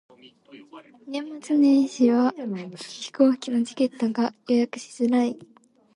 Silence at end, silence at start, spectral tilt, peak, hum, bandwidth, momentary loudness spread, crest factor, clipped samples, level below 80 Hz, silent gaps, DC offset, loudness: 0.6 s; 0.55 s; -5.5 dB/octave; -6 dBFS; none; 11 kHz; 15 LU; 18 dB; under 0.1%; -74 dBFS; none; under 0.1%; -23 LUFS